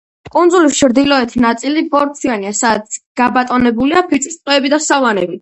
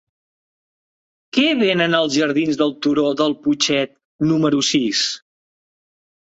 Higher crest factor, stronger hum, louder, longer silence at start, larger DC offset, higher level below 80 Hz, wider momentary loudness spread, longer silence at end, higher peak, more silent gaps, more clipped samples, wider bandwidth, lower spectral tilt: about the same, 12 dB vs 16 dB; neither; first, -13 LUFS vs -18 LUFS; second, 0.35 s vs 1.35 s; neither; first, -46 dBFS vs -60 dBFS; about the same, 6 LU vs 7 LU; second, 0.05 s vs 1.05 s; about the same, 0 dBFS vs -2 dBFS; about the same, 3.06-3.15 s vs 4.05-4.19 s; neither; about the same, 8.8 kHz vs 8.2 kHz; about the same, -3 dB/octave vs -4 dB/octave